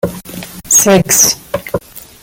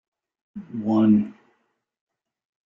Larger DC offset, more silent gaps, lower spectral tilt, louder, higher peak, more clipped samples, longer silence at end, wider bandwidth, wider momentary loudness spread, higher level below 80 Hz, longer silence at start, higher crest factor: neither; neither; second, -2.5 dB/octave vs -10 dB/octave; first, -9 LUFS vs -21 LUFS; first, 0 dBFS vs -8 dBFS; first, 0.2% vs under 0.1%; second, 0.25 s vs 1.35 s; first, over 20 kHz vs 5.6 kHz; second, 20 LU vs 24 LU; first, -42 dBFS vs -66 dBFS; second, 0.05 s vs 0.55 s; about the same, 14 dB vs 18 dB